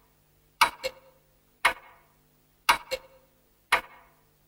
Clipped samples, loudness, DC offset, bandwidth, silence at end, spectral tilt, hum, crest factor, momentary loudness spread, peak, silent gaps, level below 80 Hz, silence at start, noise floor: under 0.1%; -27 LUFS; under 0.1%; 16.5 kHz; 0.65 s; 0 dB/octave; none; 30 dB; 12 LU; -2 dBFS; none; -60 dBFS; 0.6 s; -65 dBFS